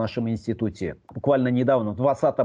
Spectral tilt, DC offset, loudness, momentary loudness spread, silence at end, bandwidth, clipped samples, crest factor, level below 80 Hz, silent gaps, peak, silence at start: -8.5 dB/octave; under 0.1%; -24 LUFS; 8 LU; 0 s; 9.2 kHz; under 0.1%; 14 dB; -54 dBFS; none; -10 dBFS; 0 s